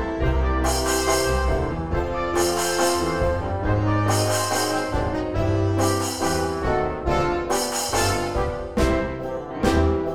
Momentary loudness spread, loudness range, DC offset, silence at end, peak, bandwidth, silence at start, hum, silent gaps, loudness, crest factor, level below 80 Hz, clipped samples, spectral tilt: 5 LU; 1 LU; 0.9%; 0 s; -6 dBFS; 19.5 kHz; 0 s; none; none; -23 LUFS; 16 dB; -30 dBFS; under 0.1%; -4.5 dB/octave